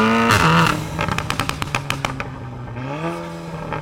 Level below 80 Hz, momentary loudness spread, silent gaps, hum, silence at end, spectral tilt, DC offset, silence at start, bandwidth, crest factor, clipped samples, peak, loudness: -38 dBFS; 16 LU; none; none; 0 s; -5 dB/octave; under 0.1%; 0 s; 17 kHz; 14 dB; under 0.1%; -6 dBFS; -20 LUFS